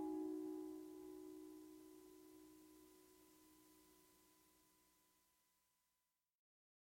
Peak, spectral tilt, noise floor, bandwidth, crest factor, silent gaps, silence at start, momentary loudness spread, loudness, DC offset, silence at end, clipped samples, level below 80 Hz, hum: -38 dBFS; -5 dB/octave; under -90 dBFS; 16.5 kHz; 18 dB; none; 0 s; 20 LU; -54 LUFS; under 0.1%; 2 s; under 0.1%; -88 dBFS; 60 Hz at -90 dBFS